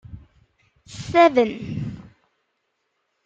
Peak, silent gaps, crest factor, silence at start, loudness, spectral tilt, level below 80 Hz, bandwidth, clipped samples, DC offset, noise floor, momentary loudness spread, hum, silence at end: -4 dBFS; none; 20 dB; 0.1 s; -19 LUFS; -6 dB/octave; -54 dBFS; 8.8 kHz; under 0.1%; under 0.1%; -74 dBFS; 24 LU; none; 1.25 s